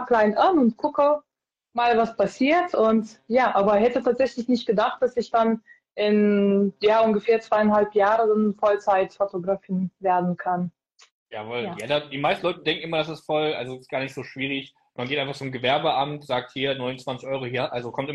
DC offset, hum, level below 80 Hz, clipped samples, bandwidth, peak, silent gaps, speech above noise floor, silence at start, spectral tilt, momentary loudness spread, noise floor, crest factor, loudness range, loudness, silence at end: under 0.1%; none; -62 dBFS; under 0.1%; 11 kHz; -8 dBFS; 11.11-11.26 s; 57 dB; 0 s; -6.5 dB/octave; 10 LU; -80 dBFS; 14 dB; 6 LU; -23 LUFS; 0 s